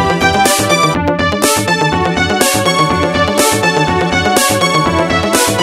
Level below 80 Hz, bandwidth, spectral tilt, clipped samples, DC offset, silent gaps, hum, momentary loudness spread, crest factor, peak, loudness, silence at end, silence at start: -34 dBFS; 16.5 kHz; -3.5 dB/octave; under 0.1%; under 0.1%; none; none; 2 LU; 12 dB; 0 dBFS; -11 LUFS; 0 s; 0 s